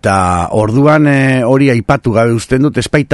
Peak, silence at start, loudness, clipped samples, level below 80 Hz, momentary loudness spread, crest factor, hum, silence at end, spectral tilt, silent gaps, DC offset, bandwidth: 0 dBFS; 0.05 s; -11 LUFS; 0.2%; -34 dBFS; 4 LU; 10 dB; none; 0 s; -6.5 dB/octave; none; under 0.1%; 12 kHz